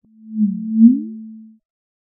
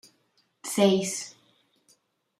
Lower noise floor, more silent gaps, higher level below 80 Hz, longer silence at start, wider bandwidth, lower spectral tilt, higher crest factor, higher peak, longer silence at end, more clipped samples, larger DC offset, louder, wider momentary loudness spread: second, -37 dBFS vs -70 dBFS; neither; about the same, -78 dBFS vs -74 dBFS; second, 0.25 s vs 0.65 s; second, 0.4 kHz vs 15.5 kHz; first, -20 dB/octave vs -4.5 dB/octave; about the same, 18 dB vs 22 dB; first, 0 dBFS vs -8 dBFS; second, 0.7 s vs 1.1 s; neither; neither; first, -16 LUFS vs -25 LUFS; first, 22 LU vs 18 LU